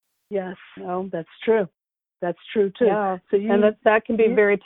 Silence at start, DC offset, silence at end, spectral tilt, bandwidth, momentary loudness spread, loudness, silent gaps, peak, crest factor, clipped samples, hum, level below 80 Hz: 0.3 s; under 0.1%; 0.1 s; -10 dB/octave; 4 kHz; 13 LU; -22 LUFS; none; -2 dBFS; 20 dB; under 0.1%; none; -62 dBFS